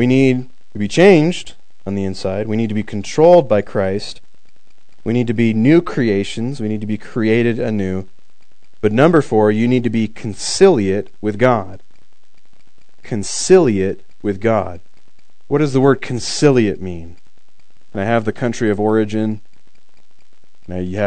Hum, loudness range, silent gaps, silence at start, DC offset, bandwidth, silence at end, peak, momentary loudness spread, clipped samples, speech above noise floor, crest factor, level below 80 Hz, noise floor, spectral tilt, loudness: none; 4 LU; none; 0 s; 4%; 9.4 kHz; 0 s; 0 dBFS; 14 LU; 0.1%; 45 dB; 16 dB; -50 dBFS; -60 dBFS; -6 dB/octave; -16 LUFS